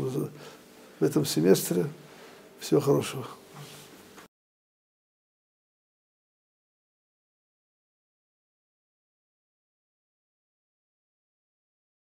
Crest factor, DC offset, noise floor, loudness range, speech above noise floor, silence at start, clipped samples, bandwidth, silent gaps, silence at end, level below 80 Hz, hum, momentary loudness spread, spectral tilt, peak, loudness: 26 dB; under 0.1%; -50 dBFS; 8 LU; 24 dB; 0 s; under 0.1%; 16 kHz; none; 7.8 s; -76 dBFS; none; 25 LU; -5.5 dB/octave; -8 dBFS; -27 LUFS